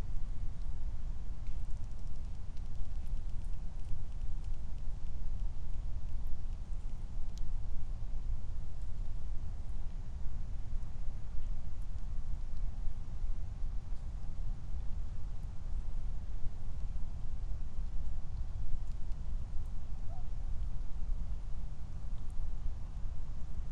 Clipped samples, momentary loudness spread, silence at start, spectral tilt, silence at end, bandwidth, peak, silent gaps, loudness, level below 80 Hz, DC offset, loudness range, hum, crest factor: under 0.1%; 3 LU; 0 s; -7 dB/octave; 0 s; 1.7 kHz; -18 dBFS; none; -45 LUFS; -36 dBFS; under 0.1%; 1 LU; none; 12 dB